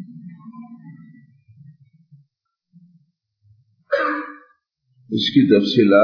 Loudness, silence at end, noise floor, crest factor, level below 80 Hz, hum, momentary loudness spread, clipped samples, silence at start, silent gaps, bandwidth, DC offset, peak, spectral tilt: -18 LUFS; 0 s; -73 dBFS; 20 dB; -76 dBFS; none; 26 LU; under 0.1%; 0 s; none; 5.4 kHz; under 0.1%; -2 dBFS; -7 dB/octave